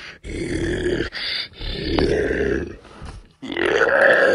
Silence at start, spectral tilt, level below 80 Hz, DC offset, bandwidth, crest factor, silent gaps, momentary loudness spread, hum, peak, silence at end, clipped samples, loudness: 0 s; -5 dB/octave; -34 dBFS; under 0.1%; 11.5 kHz; 18 dB; none; 23 LU; none; -2 dBFS; 0 s; under 0.1%; -21 LUFS